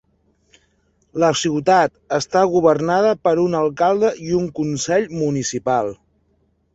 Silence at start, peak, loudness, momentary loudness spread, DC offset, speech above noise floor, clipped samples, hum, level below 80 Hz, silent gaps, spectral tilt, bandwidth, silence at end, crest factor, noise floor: 1.15 s; -2 dBFS; -18 LUFS; 6 LU; under 0.1%; 45 dB; under 0.1%; none; -54 dBFS; none; -5 dB/octave; 8.2 kHz; 0.8 s; 18 dB; -63 dBFS